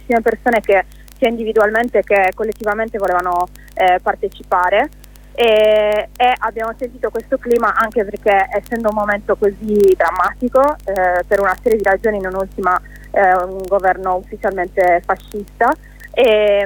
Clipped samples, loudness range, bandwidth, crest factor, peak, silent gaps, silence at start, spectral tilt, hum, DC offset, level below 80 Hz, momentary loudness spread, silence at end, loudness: under 0.1%; 2 LU; 19 kHz; 14 dB; -2 dBFS; none; 0.05 s; -5 dB/octave; 50 Hz at -40 dBFS; under 0.1%; -38 dBFS; 9 LU; 0 s; -16 LUFS